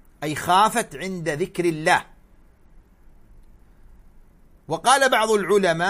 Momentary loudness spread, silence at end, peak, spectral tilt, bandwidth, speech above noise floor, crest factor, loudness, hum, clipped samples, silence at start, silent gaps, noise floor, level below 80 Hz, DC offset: 11 LU; 0 s; -2 dBFS; -3.5 dB/octave; 15.5 kHz; 32 dB; 20 dB; -21 LUFS; none; under 0.1%; 0.2 s; none; -52 dBFS; -50 dBFS; under 0.1%